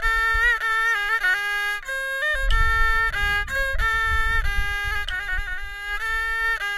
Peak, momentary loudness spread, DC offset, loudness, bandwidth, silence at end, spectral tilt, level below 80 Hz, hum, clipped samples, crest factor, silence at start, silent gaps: -8 dBFS; 7 LU; under 0.1%; -22 LUFS; 15 kHz; 0 s; -2 dB/octave; -28 dBFS; none; under 0.1%; 14 dB; 0 s; none